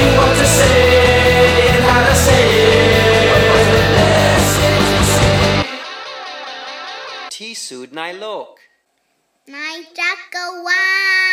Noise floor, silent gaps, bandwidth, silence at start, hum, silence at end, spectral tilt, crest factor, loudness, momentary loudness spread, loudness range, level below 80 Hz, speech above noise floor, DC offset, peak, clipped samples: -65 dBFS; none; 20 kHz; 0 s; none; 0 s; -4 dB/octave; 12 dB; -11 LUFS; 17 LU; 18 LU; -28 dBFS; 44 dB; under 0.1%; -2 dBFS; under 0.1%